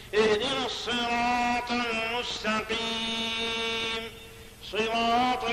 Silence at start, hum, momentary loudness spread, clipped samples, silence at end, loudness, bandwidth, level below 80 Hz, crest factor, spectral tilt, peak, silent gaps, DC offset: 0 s; none; 9 LU; under 0.1%; 0 s; -27 LUFS; 14.5 kHz; -52 dBFS; 16 dB; -3 dB/octave; -12 dBFS; none; under 0.1%